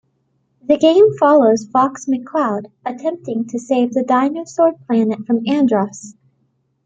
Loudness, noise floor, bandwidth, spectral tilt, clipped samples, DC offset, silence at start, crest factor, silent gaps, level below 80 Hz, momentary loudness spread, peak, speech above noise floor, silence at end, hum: -16 LUFS; -65 dBFS; 8.6 kHz; -6 dB/octave; under 0.1%; under 0.1%; 0.7 s; 14 dB; none; -64 dBFS; 12 LU; -2 dBFS; 49 dB; 0.75 s; none